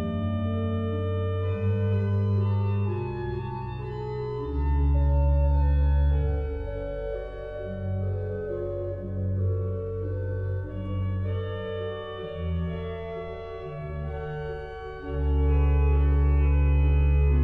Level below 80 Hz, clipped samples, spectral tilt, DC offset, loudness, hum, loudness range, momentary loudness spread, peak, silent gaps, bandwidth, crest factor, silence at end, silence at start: -28 dBFS; under 0.1%; -10.5 dB/octave; under 0.1%; -28 LUFS; none; 7 LU; 12 LU; -14 dBFS; none; 4.3 kHz; 12 dB; 0 s; 0 s